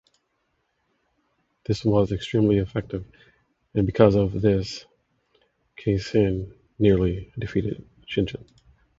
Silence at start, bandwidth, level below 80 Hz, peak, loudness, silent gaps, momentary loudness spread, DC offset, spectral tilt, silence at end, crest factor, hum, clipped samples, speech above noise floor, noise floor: 1.7 s; 7.8 kHz; -44 dBFS; -2 dBFS; -24 LUFS; none; 16 LU; under 0.1%; -8 dB/octave; 0.55 s; 24 dB; none; under 0.1%; 51 dB; -73 dBFS